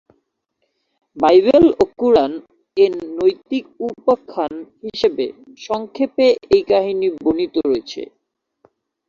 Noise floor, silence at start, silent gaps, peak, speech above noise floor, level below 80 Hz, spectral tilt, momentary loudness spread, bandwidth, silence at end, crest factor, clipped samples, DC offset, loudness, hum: -71 dBFS; 1.15 s; none; -2 dBFS; 55 dB; -52 dBFS; -6 dB/octave; 15 LU; 7.2 kHz; 1.05 s; 16 dB; under 0.1%; under 0.1%; -17 LUFS; none